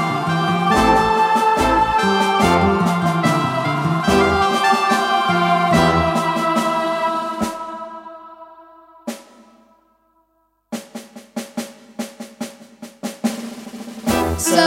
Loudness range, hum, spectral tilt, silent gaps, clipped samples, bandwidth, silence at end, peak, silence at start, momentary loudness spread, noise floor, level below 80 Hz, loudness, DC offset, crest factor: 18 LU; none; -5 dB/octave; none; under 0.1%; 16.5 kHz; 0 s; -2 dBFS; 0 s; 18 LU; -64 dBFS; -40 dBFS; -17 LUFS; under 0.1%; 18 dB